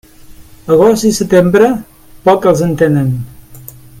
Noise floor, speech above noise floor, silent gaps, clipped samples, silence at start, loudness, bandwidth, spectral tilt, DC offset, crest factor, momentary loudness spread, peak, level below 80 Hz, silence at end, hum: -36 dBFS; 26 dB; none; under 0.1%; 0.3 s; -11 LUFS; 17 kHz; -6.5 dB/octave; under 0.1%; 12 dB; 13 LU; 0 dBFS; -40 dBFS; 0.35 s; none